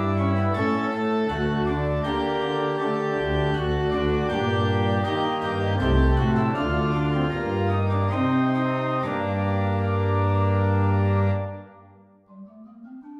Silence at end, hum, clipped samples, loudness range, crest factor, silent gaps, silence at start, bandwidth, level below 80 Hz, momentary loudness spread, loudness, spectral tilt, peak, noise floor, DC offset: 0 s; none; under 0.1%; 2 LU; 14 dB; none; 0 s; 6.6 kHz; -34 dBFS; 4 LU; -23 LUFS; -8.5 dB/octave; -8 dBFS; -52 dBFS; under 0.1%